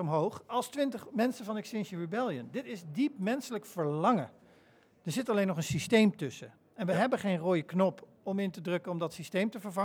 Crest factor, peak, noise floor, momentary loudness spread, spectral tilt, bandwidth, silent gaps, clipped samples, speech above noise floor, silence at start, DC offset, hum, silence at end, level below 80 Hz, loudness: 20 dB; -14 dBFS; -63 dBFS; 11 LU; -6 dB/octave; 18 kHz; none; under 0.1%; 31 dB; 0 s; under 0.1%; none; 0 s; -72 dBFS; -33 LUFS